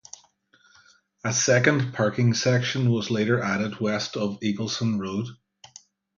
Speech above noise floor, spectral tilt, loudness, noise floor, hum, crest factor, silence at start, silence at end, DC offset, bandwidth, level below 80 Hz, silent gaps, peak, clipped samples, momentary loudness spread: 37 dB; -4.5 dB/octave; -24 LUFS; -61 dBFS; none; 20 dB; 1.25 s; 0.85 s; under 0.1%; 7.4 kHz; -62 dBFS; none; -4 dBFS; under 0.1%; 10 LU